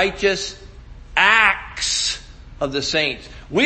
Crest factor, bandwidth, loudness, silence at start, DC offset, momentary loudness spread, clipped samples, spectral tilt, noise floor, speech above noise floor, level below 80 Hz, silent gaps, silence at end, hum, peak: 20 dB; 8.8 kHz; -18 LUFS; 0 s; under 0.1%; 15 LU; under 0.1%; -2 dB/octave; -39 dBFS; 18 dB; -42 dBFS; none; 0 s; none; 0 dBFS